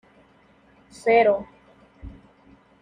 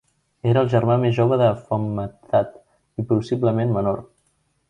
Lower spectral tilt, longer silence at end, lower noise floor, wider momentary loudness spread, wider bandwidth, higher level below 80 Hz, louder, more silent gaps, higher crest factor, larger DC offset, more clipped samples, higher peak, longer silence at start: second, -5 dB/octave vs -9 dB/octave; about the same, 0.7 s vs 0.65 s; second, -57 dBFS vs -67 dBFS; first, 27 LU vs 12 LU; first, 10 kHz vs 7.4 kHz; about the same, -52 dBFS vs -52 dBFS; about the same, -21 LUFS vs -21 LUFS; neither; about the same, 20 dB vs 16 dB; neither; neither; about the same, -6 dBFS vs -6 dBFS; first, 1.05 s vs 0.45 s